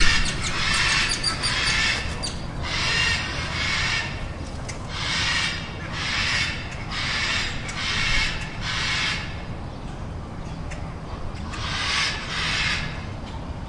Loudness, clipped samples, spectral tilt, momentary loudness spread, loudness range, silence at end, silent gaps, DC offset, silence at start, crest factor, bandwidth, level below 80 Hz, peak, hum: -24 LUFS; under 0.1%; -2.5 dB/octave; 14 LU; 7 LU; 0 s; none; under 0.1%; 0 s; 20 dB; 11.5 kHz; -34 dBFS; -4 dBFS; none